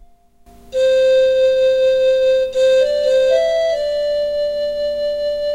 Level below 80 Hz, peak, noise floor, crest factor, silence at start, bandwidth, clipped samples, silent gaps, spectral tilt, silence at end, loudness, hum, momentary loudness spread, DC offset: -48 dBFS; -4 dBFS; -47 dBFS; 10 dB; 0.65 s; 10.5 kHz; under 0.1%; none; -2 dB/octave; 0 s; -16 LUFS; 50 Hz at -50 dBFS; 7 LU; under 0.1%